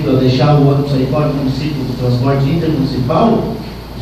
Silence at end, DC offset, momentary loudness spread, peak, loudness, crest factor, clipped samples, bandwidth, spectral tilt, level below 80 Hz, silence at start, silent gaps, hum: 0 s; under 0.1%; 8 LU; 0 dBFS; -14 LUFS; 12 dB; under 0.1%; 14 kHz; -8.5 dB/octave; -32 dBFS; 0 s; none; none